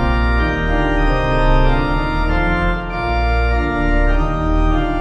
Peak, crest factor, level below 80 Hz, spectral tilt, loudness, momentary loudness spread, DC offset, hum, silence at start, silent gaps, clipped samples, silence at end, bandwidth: -2 dBFS; 12 dB; -18 dBFS; -7.5 dB/octave; -18 LUFS; 3 LU; under 0.1%; none; 0 s; none; under 0.1%; 0 s; 6.6 kHz